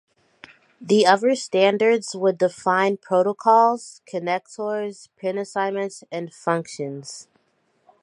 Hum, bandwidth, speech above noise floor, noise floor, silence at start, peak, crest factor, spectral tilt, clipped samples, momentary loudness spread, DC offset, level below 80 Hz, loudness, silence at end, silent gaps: none; 11.5 kHz; 46 dB; -67 dBFS; 0.8 s; -2 dBFS; 20 dB; -4.5 dB/octave; under 0.1%; 15 LU; under 0.1%; -76 dBFS; -21 LUFS; 0.8 s; none